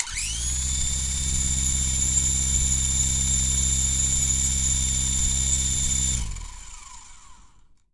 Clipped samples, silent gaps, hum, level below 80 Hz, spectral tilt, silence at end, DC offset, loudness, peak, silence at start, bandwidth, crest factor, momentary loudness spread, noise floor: under 0.1%; none; none; -30 dBFS; -1.5 dB/octave; 0.6 s; 0.3%; -21 LUFS; -6 dBFS; 0 s; 12 kHz; 18 dB; 7 LU; -54 dBFS